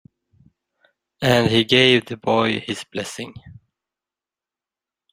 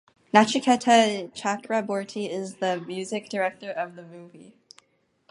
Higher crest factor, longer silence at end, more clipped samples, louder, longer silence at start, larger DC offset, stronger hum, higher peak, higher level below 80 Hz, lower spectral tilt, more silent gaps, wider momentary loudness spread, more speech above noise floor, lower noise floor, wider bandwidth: about the same, 20 dB vs 24 dB; first, 1.6 s vs 0.9 s; neither; first, -18 LUFS vs -25 LUFS; first, 1.2 s vs 0.35 s; neither; neither; about the same, -2 dBFS vs -2 dBFS; first, -56 dBFS vs -74 dBFS; about the same, -5 dB/octave vs -4 dB/octave; neither; first, 16 LU vs 13 LU; first, 71 dB vs 44 dB; first, -90 dBFS vs -69 dBFS; first, 16 kHz vs 11.5 kHz